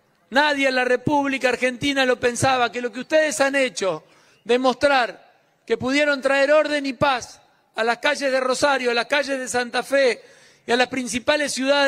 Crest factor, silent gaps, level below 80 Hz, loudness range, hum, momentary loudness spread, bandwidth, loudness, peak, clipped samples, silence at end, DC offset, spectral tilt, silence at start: 18 dB; none; -60 dBFS; 1 LU; none; 8 LU; 15.5 kHz; -20 LUFS; -2 dBFS; under 0.1%; 0 s; under 0.1%; -3 dB/octave; 0.3 s